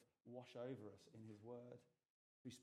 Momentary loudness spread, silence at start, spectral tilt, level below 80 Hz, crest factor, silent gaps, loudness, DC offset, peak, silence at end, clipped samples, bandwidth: 9 LU; 0 s; -6 dB/octave; under -90 dBFS; 18 dB; 2.10-2.45 s; -58 LUFS; under 0.1%; -40 dBFS; 0 s; under 0.1%; 13 kHz